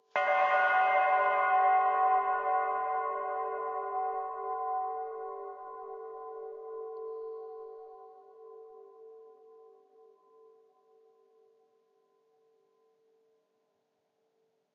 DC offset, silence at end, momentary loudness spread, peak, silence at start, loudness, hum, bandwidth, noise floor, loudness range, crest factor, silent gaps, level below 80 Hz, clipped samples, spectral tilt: under 0.1%; 5.45 s; 20 LU; -14 dBFS; 0.15 s; -30 LUFS; none; 6.2 kHz; -78 dBFS; 21 LU; 18 dB; none; -82 dBFS; under 0.1%; 2 dB/octave